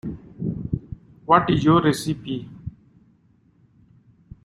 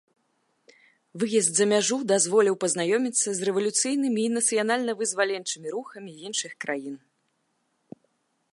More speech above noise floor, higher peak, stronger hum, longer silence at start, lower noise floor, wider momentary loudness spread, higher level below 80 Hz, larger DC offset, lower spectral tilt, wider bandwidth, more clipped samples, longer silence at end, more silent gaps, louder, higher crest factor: second, 40 dB vs 48 dB; first, -2 dBFS vs -8 dBFS; neither; second, 0.05 s vs 1.15 s; second, -59 dBFS vs -73 dBFS; first, 21 LU vs 12 LU; first, -48 dBFS vs -82 dBFS; neither; first, -6.5 dB/octave vs -2.5 dB/octave; first, 15.5 kHz vs 11.5 kHz; neither; first, 1.75 s vs 1.55 s; neither; about the same, -22 LUFS vs -24 LUFS; first, 24 dB vs 18 dB